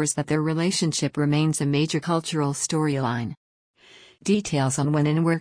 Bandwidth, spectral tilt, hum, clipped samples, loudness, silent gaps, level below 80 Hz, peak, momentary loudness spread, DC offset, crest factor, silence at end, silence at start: 10.5 kHz; -5 dB/octave; none; under 0.1%; -24 LUFS; 3.37-3.74 s; -58 dBFS; -10 dBFS; 4 LU; under 0.1%; 14 dB; 0 s; 0 s